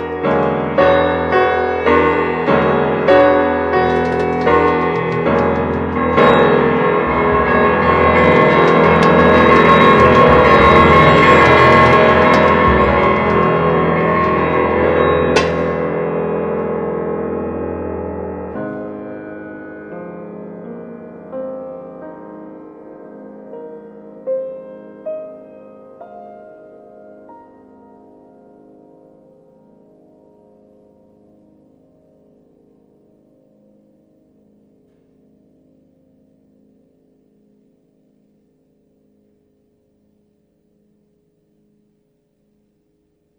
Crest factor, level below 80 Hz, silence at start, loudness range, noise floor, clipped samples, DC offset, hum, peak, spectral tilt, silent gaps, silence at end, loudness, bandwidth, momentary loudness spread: 16 dB; -36 dBFS; 0 s; 22 LU; -62 dBFS; under 0.1%; under 0.1%; none; 0 dBFS; -7 dB/octave; none; 16.05 s; -12 LUFS; 9.6 kHz; 23 LU